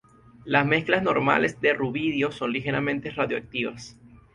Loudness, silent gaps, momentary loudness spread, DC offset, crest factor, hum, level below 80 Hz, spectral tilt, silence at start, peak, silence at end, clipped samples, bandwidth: -24 LUFS; none; 9 LU; under 0.1%; 22 dB; none; -58 dBFS; -6 dB/octave; 0.45 s; -4 dBFS; 0.2 s; under 0.1%; 11 kHz